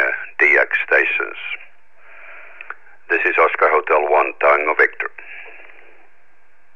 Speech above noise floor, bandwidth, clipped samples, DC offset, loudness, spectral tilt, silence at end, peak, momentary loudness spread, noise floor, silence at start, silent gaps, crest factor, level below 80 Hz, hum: 41 dB; 7.2 kHz; under 0.1%; 1%; -16 LUFS; -3.5 dB/octave; 1.25 s; -2 dBFS; 22 LU; -58 dBFS; 0 s; none; 18 dB; -78 dBFS; none